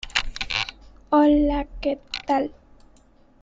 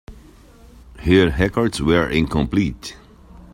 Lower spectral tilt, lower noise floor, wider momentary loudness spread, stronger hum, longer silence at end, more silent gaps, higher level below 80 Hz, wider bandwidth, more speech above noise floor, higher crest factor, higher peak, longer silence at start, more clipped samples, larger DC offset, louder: second, -4 dB/octave vs -6 dB/octave; first, -55 dBFS vs -46 dBFS; about the same, 12 LU vs 12 LU; neither; first, 0.9 s vs 0.1 s; neither; about the same, -38 dBFS vs -34 dBFS; second, 7.8 kHz vs 16 kHz; first, 34 dB vs 28 dB; about the same, 20 dB vs 18 dB; about the same, -4 dBFS vs -2 dBFS; about the same, 0.05 s vs 0.1 s; neither; neither; second, -23 LUFS vs -18 LUFS